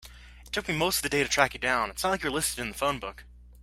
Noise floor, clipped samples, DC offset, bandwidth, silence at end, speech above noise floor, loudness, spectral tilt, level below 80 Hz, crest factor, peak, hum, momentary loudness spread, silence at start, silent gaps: -48 dBFS; under 0.1%; under 0.1%; 16 kHz; 0 s; 20 dB; -27 LUFS; -2.5 dB/octave; -48 dBFS; 24 dB; -4 dBFS; 60 Hz at -50 dBFS; 9 LU; 0 s; none